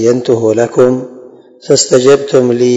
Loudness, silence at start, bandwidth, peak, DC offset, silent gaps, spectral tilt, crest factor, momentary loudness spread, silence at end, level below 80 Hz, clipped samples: -10 LUFS; 0 s; 8.8 kHz; 0 dBFS; under 0.1%; none; -4.5 dB/octave; 10 dB; 5 LU; 0 s; -54 dBFS; 2%